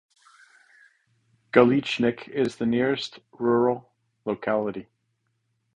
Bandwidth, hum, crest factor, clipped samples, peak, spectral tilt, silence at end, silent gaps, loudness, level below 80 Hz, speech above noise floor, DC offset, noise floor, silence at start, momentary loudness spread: 9.6 kHz; none; 24 dB; under 0.1%; -4 dBFS; -6.5 dB/octave; 0.95 s; none; -24 LUFS; -64 dBFS; 51 dB; under 0.1%; -74 dBFS; 1.55 s; 14 LU